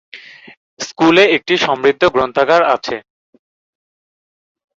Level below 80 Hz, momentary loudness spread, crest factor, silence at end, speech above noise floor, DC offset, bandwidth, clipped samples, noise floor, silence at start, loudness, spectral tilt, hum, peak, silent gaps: -52 dBFS; 17 LU; 16 dB; 1.8 s; over 77 dB; under 0.1%; 7.8 kHz; under 0.1%; under -90 dBFS; 0.15 s; -13 LUFS; -4 dB/octave; none; 0 dBFS; 0.57-0.77 s